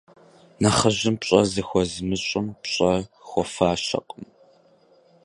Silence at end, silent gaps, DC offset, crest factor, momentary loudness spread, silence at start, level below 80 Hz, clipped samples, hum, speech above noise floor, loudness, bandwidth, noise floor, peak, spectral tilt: 1 s; none; under 0.1%; 24 dB; 8 LU; 0.6 s; -48 dBFS; under 0.1%; none; 34 dB; -23 LUFS; 11.5 kHz; -57 dBFS; -2 dBFS; -4.5 dB/octave